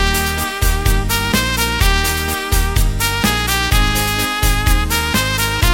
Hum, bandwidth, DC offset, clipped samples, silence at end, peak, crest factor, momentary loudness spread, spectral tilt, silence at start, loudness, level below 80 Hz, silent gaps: none; 17 kHz; under 0.1%; under 0.1%; 0 s; 0 dBFS; 14 dB; 3 LU; -3 dB/octave; 0 s; -16 LUFS; -18 dBFS; none